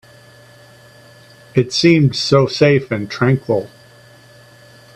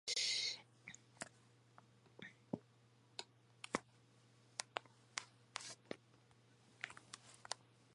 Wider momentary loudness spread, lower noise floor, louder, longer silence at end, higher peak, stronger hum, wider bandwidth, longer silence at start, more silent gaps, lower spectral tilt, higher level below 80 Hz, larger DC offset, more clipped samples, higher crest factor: second, 9 LU vs 18 LU; second, -44 dBFS vs -71 dBFS; first, -15 LUFS vs -47 LUFS; first, 1.3 s vs 0.3 s; first, 0 dBFS vs -18 dBFS; neither; about the same, 11.5 kHz vs 11 kHz; first, 1.55 s vs 0.05 s; neither; first, -6 dB/octave vs -1 dB/octave; first, -52 dBFS vs -86 dBFS; neither; neither; second, 18 dB vs 32 dB